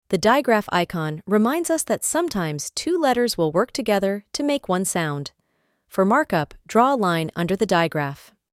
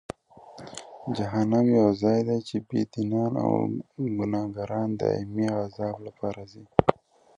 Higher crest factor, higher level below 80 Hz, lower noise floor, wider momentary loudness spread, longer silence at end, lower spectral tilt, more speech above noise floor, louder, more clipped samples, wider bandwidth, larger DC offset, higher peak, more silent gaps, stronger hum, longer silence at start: second, 18 dB vs 26 dB; about the same, -56 dBFS vs -56 dBFS; first, -69 dBFS vs -49 dBFS; second, 8 LU vs 18 LU; about the same, 0.4 s vs 0.45 s; second, -4.5 dB/octave vs -8 dB/octave; first, 48 dB vs 23 dB; first, -21 LUFS vs -27 LUFS; neither; first, 16.5 kHz vs 10.5 kHz; neither; second, -4 dBFS vs 0 dBFS; neither; neither; second, 0.1 s vs 0.35 s